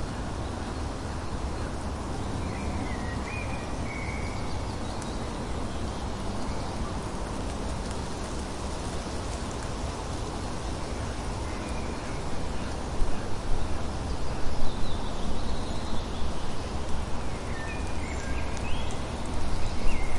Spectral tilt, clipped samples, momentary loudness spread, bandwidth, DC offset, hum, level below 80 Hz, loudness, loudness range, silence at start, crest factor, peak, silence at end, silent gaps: -5 dB/octave; under 0.1%; 2 LU; 11.5 kHz; under 0.1%; none; -34 dBFS; -34 LUFS; 1 LU; 0 s; 18 dB; -10 dBFS; 0 s; none